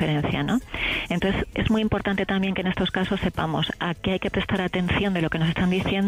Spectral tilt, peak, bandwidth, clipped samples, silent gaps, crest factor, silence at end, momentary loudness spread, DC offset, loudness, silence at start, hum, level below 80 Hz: -6.5 dB/octave; -10 dBFS; 15 kHz; under 0.1%; none; 14 dB; 0 s; 3 LU; under 0.1%; -24 LUFS; 0 s; none; -40 dBFS